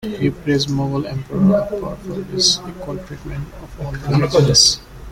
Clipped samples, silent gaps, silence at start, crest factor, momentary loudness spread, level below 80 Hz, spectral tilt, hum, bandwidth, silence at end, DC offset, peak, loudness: under 0.1%; none; 0 s; 18 dB; 18 LU; -38 dBFS; -4 dB/octave; none; 16 kHz; 0 s; under 0.1%; 0 dBFS; -16 LUFS